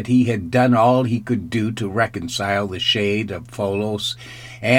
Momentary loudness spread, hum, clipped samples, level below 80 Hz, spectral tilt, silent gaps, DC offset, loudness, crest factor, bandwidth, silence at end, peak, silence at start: 10 LU; none; under 0.1%; -52 dBFS; -5.5 dB/octave; none; under 0.1%; -20 LUFS; 18 dB; 16 kHz; 0 s; -2 dBFS; 0 s